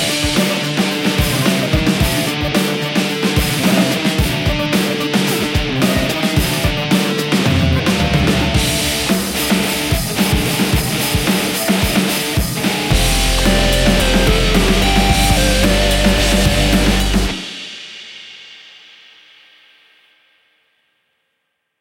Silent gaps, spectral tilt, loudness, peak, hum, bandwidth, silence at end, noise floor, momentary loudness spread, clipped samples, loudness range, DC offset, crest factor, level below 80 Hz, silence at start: none; -4 dB/octave; -15 LUFS; 0 dBFS; none; 17 kHz; 3.2 s; -70 dBFS; 4 LU; under 0.1%; 4 LU; under 0.1%; 16 dB; -24 dBFS; 0 s